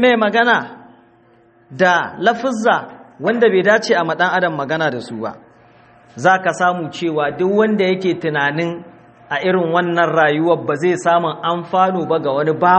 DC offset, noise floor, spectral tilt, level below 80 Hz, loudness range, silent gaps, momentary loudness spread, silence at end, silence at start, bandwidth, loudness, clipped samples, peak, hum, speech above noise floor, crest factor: under 0.1%; -51 dBFS; -5.5 dB/octave; -62 dBFS; 2 LU; none; 8 LU; 0 s; 0 s; 8.8 kHz; -16 LUFS; under 0.1%; 0 dBFS; none; 35 dB; 16 dB